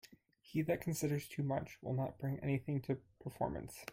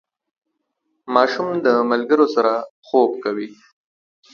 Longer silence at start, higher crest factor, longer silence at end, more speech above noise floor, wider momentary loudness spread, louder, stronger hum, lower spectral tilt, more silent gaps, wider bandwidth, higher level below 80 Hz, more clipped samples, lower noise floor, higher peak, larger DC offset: second, 0.05 s vs 1.05 s; about the same, 16 dB vs 20 dB; second, 0 s vs 0.8 s; second, 24 dB vs 56 dB; second, 6 LU vs 9 LU; second, -40 LUFS vs -18 LUFS; neither; about the same, -6.5 dB/octave vs -6 dB/octave; second, none vs 2.70-2.82 s; first, 16.5 kHz vs 6.8 kHz; first, -64 dBFS vs -70 dBFS; neither; second, -64 dBFS vs -74 dBFS; second, -24 dBFS vs 0 dBFS; neither